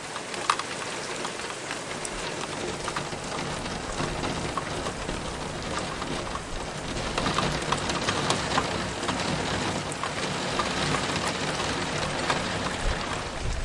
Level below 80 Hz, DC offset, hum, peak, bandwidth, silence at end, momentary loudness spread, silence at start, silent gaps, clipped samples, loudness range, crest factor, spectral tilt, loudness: -42 dBFS; under 0.1%; none; -6 dBFS; 11.5 kHz; 0 s; 6 LU; 0 s; none; under 0.1%; 4 LU; 24 dB; -3.5 dB/octave; -29 LUFS